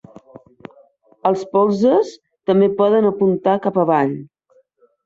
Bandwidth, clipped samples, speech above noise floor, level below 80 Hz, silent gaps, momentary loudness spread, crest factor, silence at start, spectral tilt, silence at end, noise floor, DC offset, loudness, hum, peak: 7.6 kHz; under 0.1%; 42 dB; -64 dBFS; none; 8 LU; 16 dB; 1.25 s; -8 dB/octave; 0.8 s; -58 dBFS; under 0.1%; -17 LUFS; none; -4 dBFS